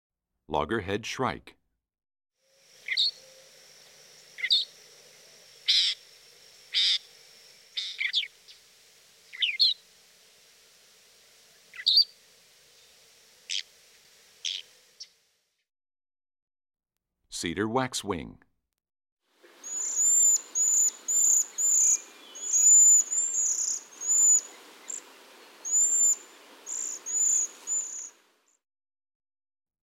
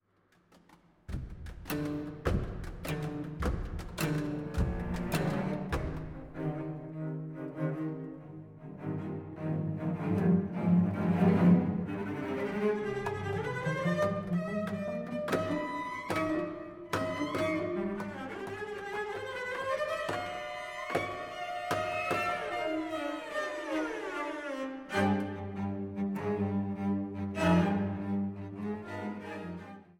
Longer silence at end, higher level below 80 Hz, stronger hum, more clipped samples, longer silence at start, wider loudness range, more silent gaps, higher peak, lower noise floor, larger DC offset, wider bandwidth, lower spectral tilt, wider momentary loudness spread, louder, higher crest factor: first, 1.75 s vs 0.1 s; second, -66 dBFS vs -48 dBFS; neither; neither; about the same, 0.5 s vs 0.55 s; first, 17 LU vs 8 LU; first, 16.42-16.47 s, 19.12-19.17 s vs none; first, -10 dBFS vs -14 dBFS; first, -80 dBFS vs -69 dBFS; neither; about the same, 16 kHz vs 17 kHz; second, 0.5 dB/octave vs -7 dB/octave; first, 18 LU vs 12 LU; first, -23 LUFS vs -34 LUFS; about the same, 20 dB vs 20 dB